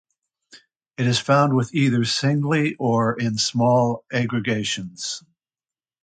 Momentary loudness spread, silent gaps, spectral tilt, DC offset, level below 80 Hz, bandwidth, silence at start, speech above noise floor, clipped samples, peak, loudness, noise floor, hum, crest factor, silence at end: 10 LU; none; -5 dB/octave; under 0.1%; -60 dBFS; 9.4 kHz; 0.55 s; over 69 dB; under 0.1%; -4 dBFS; -21 LUFS; under -90 dBFS; none; 18 dB; 0.85 s